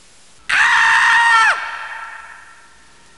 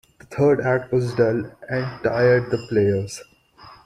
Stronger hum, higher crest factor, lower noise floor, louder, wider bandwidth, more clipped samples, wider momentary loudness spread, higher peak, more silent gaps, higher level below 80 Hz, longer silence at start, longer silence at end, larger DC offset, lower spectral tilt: neither; about the same, 14 dB vs 16 dB; about the same, -48 dBFS vs -47 dBFS; first, -12 LUFS vs -21 LUFS; about the same, 11.5 kHz vs 12.5 kHz; neither; first, 20 LU vs 10 LU; first, -2 dBFS vs -6 dBFS; neither; about the same, -56 dBFS vs -54 dBFS; first, 0.5 s vs 0.3 s; first, 0.85 s vs 0.1 s; first, 0.4% vs under 0.1%; second, 1.5 dB/octave vs -7 dB/octave